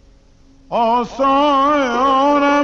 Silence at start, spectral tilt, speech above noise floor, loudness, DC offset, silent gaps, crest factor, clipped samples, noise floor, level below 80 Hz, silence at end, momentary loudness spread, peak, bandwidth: 0.7 s; -4.5 dB/octave; 33 dB; -15 LUFS; under 0.1%; none; 10 dB; under 0.1%; -47 dBFS; -44 dBFS; 0 s; 4 LU; -6 dBFS; 7.4 kHz